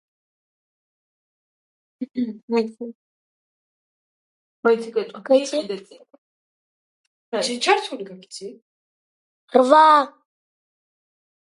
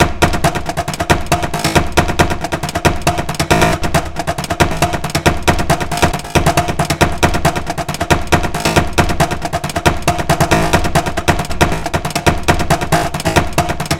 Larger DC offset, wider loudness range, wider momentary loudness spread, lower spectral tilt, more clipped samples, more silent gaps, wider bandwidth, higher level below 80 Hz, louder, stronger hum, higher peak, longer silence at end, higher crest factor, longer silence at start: neither; first, 11 LU vs 1 LU; first, 22 LU vs 6 LU; second, -3 dB/octave vs -4.5 dB/octave; neither; first, 2.43-2.48 s, 2.95-4.63 s, 6.18-7.32 s, 8.62-9.48 s vs none; second, 11.5 kHz vs 17.5 kHz; second, -80 dBFS vs -24 dBFS; second, -19 LUFS vs -15 LUFS; neither; about the same, 0 dBFS vs 0 dBFS; first, 1.4 s vs 0 s; first, 24 dB vs 14 dB; first, 2 s vs 0 s